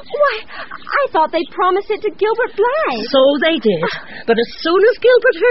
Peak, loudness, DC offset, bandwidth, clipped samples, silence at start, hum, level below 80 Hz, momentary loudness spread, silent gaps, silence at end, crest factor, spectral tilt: -2 dBFS; -15 LUFS; 2%; 6 kHz; under 0.1%; 0.1 s; none; -50 dBFS; 9 LU; none; 0 s; 14 dB; -1.5 dB/octave